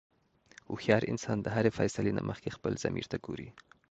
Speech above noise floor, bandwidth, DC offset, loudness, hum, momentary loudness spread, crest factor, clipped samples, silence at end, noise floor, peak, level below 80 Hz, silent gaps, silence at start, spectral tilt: 28 dB; 8.8 kHz; under 0.1%; -33 LUFS; none; 14 LU; 24 dB; under 0.1%; 0.3 s; -60 dBFS; -10 dBFS; -58 dBFS; none; 0.7 s; -6 dB/octave